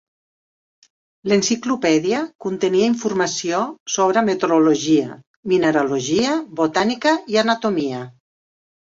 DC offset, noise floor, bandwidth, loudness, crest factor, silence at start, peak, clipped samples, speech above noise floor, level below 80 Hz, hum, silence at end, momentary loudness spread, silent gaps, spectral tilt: under 0.1%; under -90 dBFS; 7.8 kHz; -19 LUFS; 16 dB; 1.25 s; -2 dBFS; under 0.1%; over 72 dB; -62 dBFS; none; 0.75 s; 7 LU; 2.35-2.39 s, 3.80-3.86 s, 5.27-5.43 s; -4 dB/octave